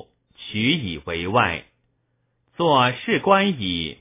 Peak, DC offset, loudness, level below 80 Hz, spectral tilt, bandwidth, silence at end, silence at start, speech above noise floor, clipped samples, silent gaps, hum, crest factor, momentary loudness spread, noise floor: -2 dBFS; under 0.1%; -21 LUFS; -48 dBFS; -9.5 dB/octave; 3.9 kHz; 0.05 s; 0.4 s; 49 dB; under 0.1%; none; none; 22 dB; 11 LU; -70 dBFS